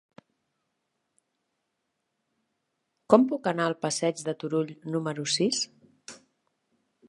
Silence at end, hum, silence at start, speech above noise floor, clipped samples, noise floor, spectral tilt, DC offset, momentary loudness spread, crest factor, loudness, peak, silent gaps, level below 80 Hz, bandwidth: 0.95 s; none; 3.1 s; 54 dB; under 0.1%; -80 dBFS; -4 dB/octave; under 0.1%; 13 LU; 28 dB; -27 LUFS; -2 dBFS; none; -78 dBFS; 11.5 kHz